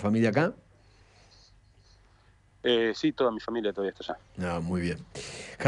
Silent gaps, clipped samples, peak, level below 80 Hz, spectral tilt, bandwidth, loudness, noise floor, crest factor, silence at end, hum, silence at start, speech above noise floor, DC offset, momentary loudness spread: none; under 0.1%; -12 dBFS; -58 dBFS; -6 dB/octave; 11 kHz; -30 LUFS; -61 dBFS; 18 dB; 0 s; none; 0 s; 32 dB; under 0.1%; 14 LU